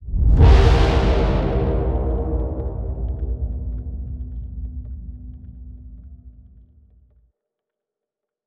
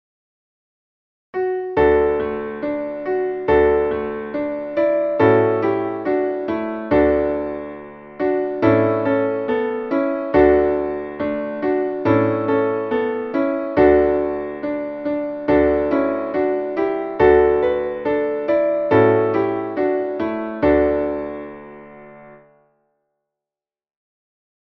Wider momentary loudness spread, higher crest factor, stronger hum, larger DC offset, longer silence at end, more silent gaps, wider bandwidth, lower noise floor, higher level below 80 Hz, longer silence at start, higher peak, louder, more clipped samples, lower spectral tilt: first, 25 LU vs 10 LU; about the same, 18 dB vs 18 dB; neither; neither; second, 2.15 s vs 2.4 s; neither; first, 7.2 kHz vs 5.8 kHz; second, -85 dBFS vs under -90 dBFS; first, -22 dBFS vs -42 dBFS; second, 0 s vs 1.35 s; about the same, -2 dBFS vs -2 dBFS; about the same, -20 LUFS vs -19 LUFS; neither; second, -8 dB/octave vs -9.5 dB/octave